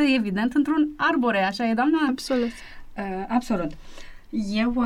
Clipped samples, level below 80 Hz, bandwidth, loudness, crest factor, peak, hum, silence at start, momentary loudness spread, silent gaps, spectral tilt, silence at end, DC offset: under 0.1%; -46 dBFS; 13.5 kHz; -24 LUFS; 14 dB; -10 dBFS; none; 0 s; 12 LU; none; -5.5 dB/octave; 0 s; under 0.1%